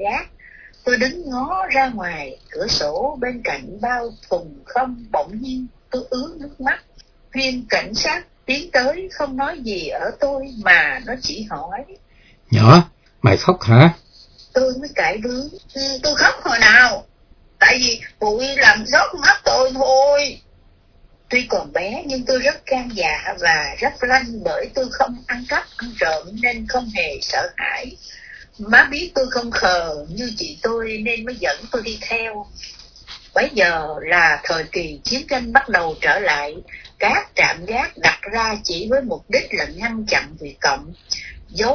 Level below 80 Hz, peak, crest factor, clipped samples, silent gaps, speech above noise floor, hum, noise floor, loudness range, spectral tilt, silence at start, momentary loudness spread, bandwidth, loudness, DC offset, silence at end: -44 dBFS; 0 dBFS; 18 dB; under 0.1%; none; 33 dB; none; -51 dBFS; 8 LU; -4.5 dB/octave; 0 s; 15 LU; 5.4 kHz; -17 LUFS; under 0.1%; 0 s